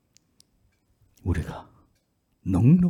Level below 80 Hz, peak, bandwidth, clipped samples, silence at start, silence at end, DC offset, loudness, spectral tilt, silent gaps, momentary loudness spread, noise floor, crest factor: -46 dBFS; -8 dBFS; 11.5 kHz; under 0.1%; 1.25 s; 0 s; under 0.1%; -26 LUFS; -9.5 dB/octave; none; 17 LU; -71 dBFS; 18 dB